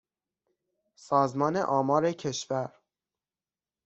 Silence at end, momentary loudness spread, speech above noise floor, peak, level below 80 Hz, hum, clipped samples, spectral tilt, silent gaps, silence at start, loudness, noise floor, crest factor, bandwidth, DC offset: 1.15 s; 8 LU; over 63 dB; -10 dBFS; -72 dBFS; none; under 0.1%; -5.5 dB/octave; none; 1.05 s; -28 LUFS; under -90 dBFS; 20 dB; 8.2 kHz; under 0.1%